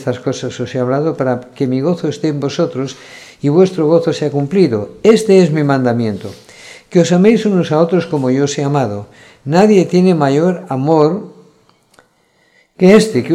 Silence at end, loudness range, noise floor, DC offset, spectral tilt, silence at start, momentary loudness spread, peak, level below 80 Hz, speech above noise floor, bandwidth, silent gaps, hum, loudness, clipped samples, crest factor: 0 s; 3 LU; -55 dBFS; under 0.1%; -7 dB/octave; 0 s; 11 LU; 0 dBFS; -56 dBFS; 43 dB; 12.5 kHz; none; none; -13 LUFS; 0.1%; 14 dB